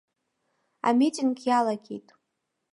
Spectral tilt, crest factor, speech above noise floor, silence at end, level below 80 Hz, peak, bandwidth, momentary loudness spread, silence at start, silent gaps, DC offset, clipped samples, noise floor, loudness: -4.5 dB/octave; 18 dB; 56 dB; 0.75 s; -84 dBFS; -10 dBFS; 11.5 kHz; 16 LU; 0.85 s; none; under 0.1%; under 0.1%; -80 dBFS; -25 LUFS